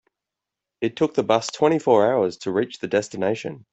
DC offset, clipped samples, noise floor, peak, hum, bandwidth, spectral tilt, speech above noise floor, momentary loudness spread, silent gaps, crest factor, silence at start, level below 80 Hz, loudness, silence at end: under 0.1%; under 0.1%; -86 dBFS; -4 dBFS; none; 8.2 kHz; -5.5 dB/octave; 65 dB; 8 LU; none; 18 dB; 0.8 s; -64 dBFS; -22 LUFS; 0.15 s